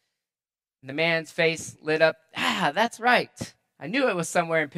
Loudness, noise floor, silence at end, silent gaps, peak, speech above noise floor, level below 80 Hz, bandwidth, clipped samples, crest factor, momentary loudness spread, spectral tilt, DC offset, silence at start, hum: -24 LUFS; under -90 dBFS; 0.1 s; none; -4 dBFS; over 65 dB; -70 dBFS; 14.5 kHz; under 0.1%; 22 dB; 13 LU; -3.5 dB/octave; under 0.1%; 0.85 s; none